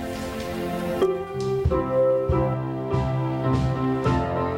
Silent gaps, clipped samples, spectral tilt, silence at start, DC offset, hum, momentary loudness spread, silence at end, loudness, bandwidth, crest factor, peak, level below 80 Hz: none; under 0.1%; -8 dB/octave; 0 s; under 0.1%; none; 7 LU; 0 s; -24 LUFS; 16.5 kHz; 14 dB; -10 dBFS; -36 dBFS